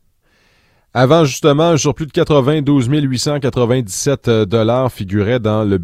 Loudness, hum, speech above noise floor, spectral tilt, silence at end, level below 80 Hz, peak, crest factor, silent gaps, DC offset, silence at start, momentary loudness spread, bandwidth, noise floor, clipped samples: -14 LUFS; none; 43 dB; -6 dB/octave; 0 s; -44 dBFS; 0 dBFS; 14 dB; none; under 0.1%; 0.95 s; 6 LU; 15.5 kHz; -56 dBFS; under 0.1%